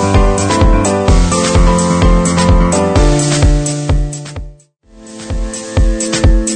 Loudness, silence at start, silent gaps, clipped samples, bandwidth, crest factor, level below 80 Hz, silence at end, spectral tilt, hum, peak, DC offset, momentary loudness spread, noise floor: -12 LUFS; 0 s; none; under 0.1%; 9.4 kHz; 10 dB; -14 dBFS; 0 s; -5 dB/octave; none; 0 dBFS; under 0.1%; 11 LU; -41 dBFS